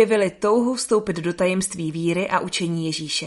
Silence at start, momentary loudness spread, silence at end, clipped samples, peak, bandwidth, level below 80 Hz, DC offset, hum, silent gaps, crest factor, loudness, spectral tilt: 0 s; 5 LU; 0 s; under 0.1%; -4 dBFS; 11.5 kHz; -56 dBFS; under 0.1%; none; none; 18 dB; -22 LUFS; -4.5 dB/octave